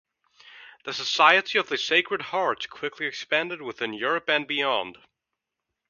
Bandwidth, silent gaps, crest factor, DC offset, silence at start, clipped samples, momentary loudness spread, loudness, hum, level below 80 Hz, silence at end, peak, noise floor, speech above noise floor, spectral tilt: 7.4 kHz; none; 26 dB; under 0.1%; 0.5 s; under 0.1%; 14 LU; -24 LUFS; none; -76 dBFS; 0.95 s; -2 dBFS; -84 dBFS; 59 dB; -2.5 dB/octave